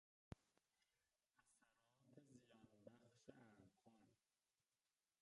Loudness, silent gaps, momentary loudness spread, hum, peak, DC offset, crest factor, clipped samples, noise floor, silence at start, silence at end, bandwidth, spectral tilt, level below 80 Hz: -68 LUFS; none; 3 LU; none; -40 dBFS; under 0.1%; 32 dB; under 0.1%; under -90 dBFS; 0.3 s; 0.35 s; 10.5 kHz; -6 dB/octave; -84 dBFS